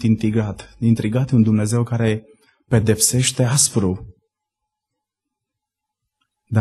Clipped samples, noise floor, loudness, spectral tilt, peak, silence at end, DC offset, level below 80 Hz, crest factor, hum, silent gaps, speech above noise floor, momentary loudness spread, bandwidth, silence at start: under 0.1%; -82 dBFS; -18 LUFS; -5 dB/octave; -2 dBFS; 0 s; under 0.1%; -48 dBFS; 18 dB; none; none; 65 dB; 8 LU; 12.5 kHz; 0 s